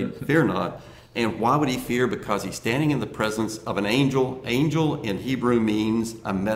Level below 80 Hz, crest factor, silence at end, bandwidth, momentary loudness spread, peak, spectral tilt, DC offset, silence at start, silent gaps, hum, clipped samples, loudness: -52 dBFS; 16 dB; 0 s; 16 kHz; 7 LU; -8 dBFS; -6 dB/octave; under 0.1%; 0 s; none; none; under 0.1%; -24 LUFS